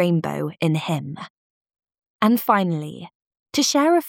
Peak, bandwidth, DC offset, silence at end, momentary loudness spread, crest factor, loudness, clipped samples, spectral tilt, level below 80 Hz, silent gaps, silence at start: -4 dBFS; 19 kHz; under 0.1%; 0 s; 18 LU; 18 dB; -21 LUFS; under 0.1%; -5 dB/octave; -70 dBFS; 1.30-1.65 s, 2.06-2.19 s, 3.15-3.20 s, 3.27-3.31 s, 3.39-3.46 s; 0 s